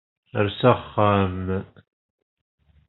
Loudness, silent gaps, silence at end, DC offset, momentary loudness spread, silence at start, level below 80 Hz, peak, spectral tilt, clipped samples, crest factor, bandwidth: -22 LUFS; none; 1.25 s; under 0.1%; 10 LU; 0.35 s; -58 dBFS; -2 dBFS; -5.5 dB/octave; under 0.1%; 22 dB; 4.2 kHz